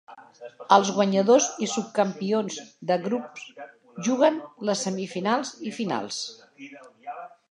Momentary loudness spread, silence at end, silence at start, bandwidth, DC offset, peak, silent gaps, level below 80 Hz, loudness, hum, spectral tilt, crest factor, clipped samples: 23 LU; 0.25 s; 0.1 s; 11 kHz; under 0.1%; -2 dBFS; none; -80 dBFS; -25 LUFS; none; -4 dB/octave; 24 dB; under 0.1%